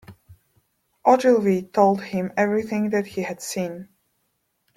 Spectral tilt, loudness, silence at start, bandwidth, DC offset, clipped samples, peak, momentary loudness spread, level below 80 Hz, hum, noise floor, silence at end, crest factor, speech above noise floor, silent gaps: -6 dB/octave; -22 LUFS; 0.1 s; 16 kHz; under 0.1%; under 0.1%; -4 dBFS; 12 LU; -66 dBFS; none; -72 dBFS; 0.9 s; 20 dB; 51 dB; none